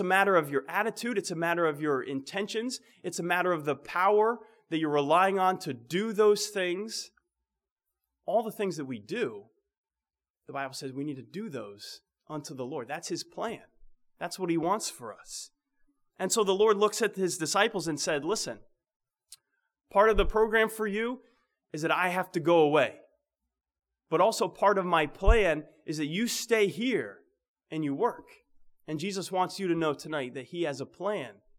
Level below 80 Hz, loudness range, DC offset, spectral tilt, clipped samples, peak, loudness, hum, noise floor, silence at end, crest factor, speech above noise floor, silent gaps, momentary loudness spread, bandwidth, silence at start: -44 dBFS; 10 LU; under 0.1%; -4 dB/octave; under 0.1%; -8 dBFS; -29 LUFS; none; under -90 dBFS; 0.25 s; 22 dB; over 61 dB; 7.72-7.76 s, 9.78-9.84 s, 10.30-10.34 s, 18.96-19.00 s, 27.48-27.54 s; 15 LU; 18 kHz; 0 s